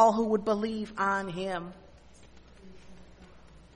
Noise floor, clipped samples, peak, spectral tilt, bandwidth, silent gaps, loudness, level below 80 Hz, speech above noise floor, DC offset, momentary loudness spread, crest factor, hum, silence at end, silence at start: -53 dBFS; under 0.1%; -10 dBFS; -5.5 dB/octave; 10.5 kHz; none; -30 LUFS; -58 dBFS; 25 dB; under 0.1%; 9 LU; 22 dB; none; 0.15 s; 0 s